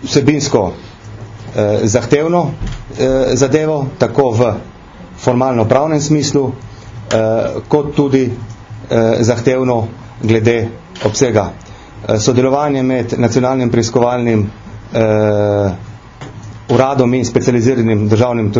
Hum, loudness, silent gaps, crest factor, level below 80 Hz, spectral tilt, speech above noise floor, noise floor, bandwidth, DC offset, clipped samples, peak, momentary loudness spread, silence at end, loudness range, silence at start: none; -14 LUFS; none; 14 dB; -38 dBFS; -6 dB/octave; 21 dB; -34 dBFS; 7.6 kHz; under 0.1%; 0.1%; 0 dBFS; 16 LU; 0 s; 1 LU; 0 s